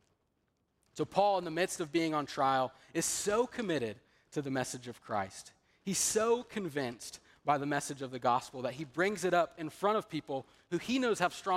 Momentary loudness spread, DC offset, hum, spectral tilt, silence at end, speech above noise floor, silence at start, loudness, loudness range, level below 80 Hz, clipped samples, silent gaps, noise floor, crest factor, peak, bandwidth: 11 LU; under 0.1%; none; -3.5 dB/octave; 0 s; 45 dB; 0.95 s; -34 LUFS; 3 LU; -70 dBFS; under 0.1%; none; -78 dBFS; 20 dB; -14 dBFS; 16 kHz